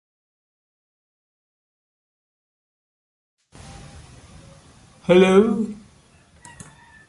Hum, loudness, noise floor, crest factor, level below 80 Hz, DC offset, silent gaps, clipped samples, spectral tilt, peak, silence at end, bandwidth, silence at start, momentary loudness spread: none; -17 LUFS; -54 dBFS; 22 dB; -54 dBFS; under 0.1%; none; under 0.1%; -6.5 dB/octave; -2 dBFS; 1.35 s; 11.5 kHz; 5.1 s; 29 LU